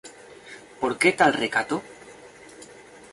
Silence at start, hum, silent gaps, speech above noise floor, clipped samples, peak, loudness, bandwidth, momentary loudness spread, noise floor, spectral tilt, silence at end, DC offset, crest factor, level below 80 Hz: 0.05 s; none; none; 24 dB; under 0.1%; -4 dBFS; -23 LUFS; 11.5 kHz; 26 LU; -47 dBFS; -3.5 dB/octave; 0.45 s; under 0.1%; 22 dB; -64 dBFS